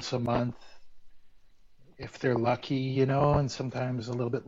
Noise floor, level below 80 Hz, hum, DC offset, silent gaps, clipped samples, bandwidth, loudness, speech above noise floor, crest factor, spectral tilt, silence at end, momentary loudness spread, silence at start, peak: -54 dBFS; -52 dBFS; none; under 0.1%; none; under 0.1%; 7.8 kHz; -29 LUFS; 25 dB; 18 dB; -7 dB/octave; 0 s; 11 LU; 0 s; -12 dBFS